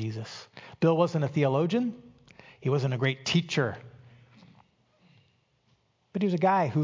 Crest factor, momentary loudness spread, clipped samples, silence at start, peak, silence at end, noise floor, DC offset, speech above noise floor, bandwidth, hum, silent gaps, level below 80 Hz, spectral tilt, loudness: 18 dB; 17 LU; under 0.1%; 0 s; -10 dBFS; 0 s; -69 dBFS; under 0.1%; 43 dB; 7.6 kHz; none; none; -66 dBFS; -6.5 dB/octave; -27 LUFS